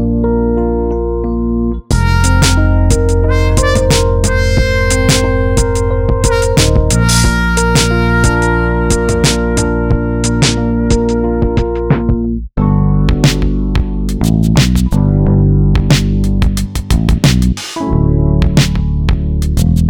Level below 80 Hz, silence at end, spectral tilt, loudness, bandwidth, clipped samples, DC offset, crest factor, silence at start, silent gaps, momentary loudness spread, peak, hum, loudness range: -16 dBFS; 0 s; -5.5 dB/octave; -12 LUFS; 19 kHz; under 0.1%; under 0.1%; 10 dB; 0 s; none; 5 LU; 0 dBFS; none; 2 LU